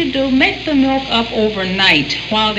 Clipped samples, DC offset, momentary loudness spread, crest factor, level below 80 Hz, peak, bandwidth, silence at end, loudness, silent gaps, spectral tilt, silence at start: under 0.1%; under 0.1%; 6 LU; 14 dB; -38 dBFS; 0 dBFS; 8.4 kHz; 0 s; -14 LUFS; none; -4.5 dB/octave; 0 s